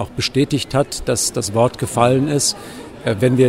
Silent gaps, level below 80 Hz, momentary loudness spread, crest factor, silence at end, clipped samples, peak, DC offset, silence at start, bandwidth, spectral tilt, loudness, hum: none; -42 dBFS; 8 LU; 16 dB; 0 s; under 0.1%; 0 dBFS; under 0.1%; 0 s; 16 kHz; -4.5 dB/octave; -18 LUFS; none